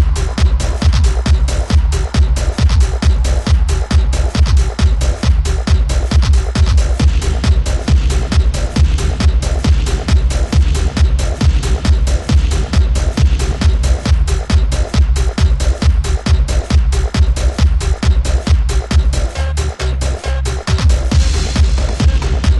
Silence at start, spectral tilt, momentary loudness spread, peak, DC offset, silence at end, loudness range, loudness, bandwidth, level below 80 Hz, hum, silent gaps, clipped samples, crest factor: 0 s; -5.5 dB/octave; 2 LU; -2 dBFS; under 0.1%; 0 s; 2 LU; -14 LUFS; 11.5 kHz; -12 dBFS; none; none; under 0.1%; 10 dB